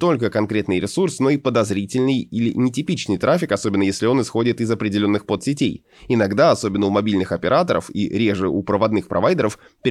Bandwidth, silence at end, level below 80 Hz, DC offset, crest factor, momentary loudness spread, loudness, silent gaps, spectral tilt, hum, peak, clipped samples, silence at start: 12.5 kHz; 0 s; -54 dBFS; under 0.1%; 14 dB; 5 LU; -20 LUFS; none; -6 dB/octave; none; -4 dBFS; under 0.1%; 0 s